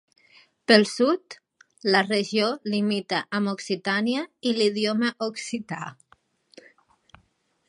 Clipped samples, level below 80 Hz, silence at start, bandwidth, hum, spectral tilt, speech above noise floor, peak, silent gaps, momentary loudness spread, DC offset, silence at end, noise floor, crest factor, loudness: under 0.1%; -74 dBFS; 0.7 s; 11.5 kHz; none; -4.5 dB/octave; 43 dB; -2 dBFS; none; 15 LU; under 0.1%; 1.75 s; -67 dBFS; 24 dB; -24 LUFS